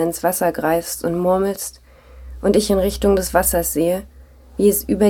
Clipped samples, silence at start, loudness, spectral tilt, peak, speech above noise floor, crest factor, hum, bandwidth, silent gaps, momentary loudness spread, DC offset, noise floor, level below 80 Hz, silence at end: under 0.1%; 0 s; -18 LUFS; -4.5 dB/octave; -2 dBFS; 21 dB; 16 dB; none; 19 kHz; none; 7 LU; under 0.1%; -39 dBFS; -36 dBFS; 0 s